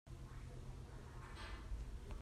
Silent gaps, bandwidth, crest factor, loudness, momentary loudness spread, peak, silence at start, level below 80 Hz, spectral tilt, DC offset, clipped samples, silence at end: none; 13.5 kHz; 14 dB; -54 LUFS; 4 LU; -36 dBFS; 0.05 s; -52 dBFS; -5.5 dB/octave; under 0.1%; under 0.1%; 0 s